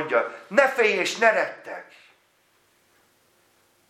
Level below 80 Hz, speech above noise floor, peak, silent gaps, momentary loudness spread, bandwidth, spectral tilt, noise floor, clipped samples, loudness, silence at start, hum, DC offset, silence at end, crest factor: -84 dBFS; 41 dB; -4 dBFS; none; 19 LU; 15 kHz; -2.5 dB/octave; -64 dBFS; under 0.1%; -21 LUFS; 0 s; none; under 0.1%; 2.05 s; 22 dB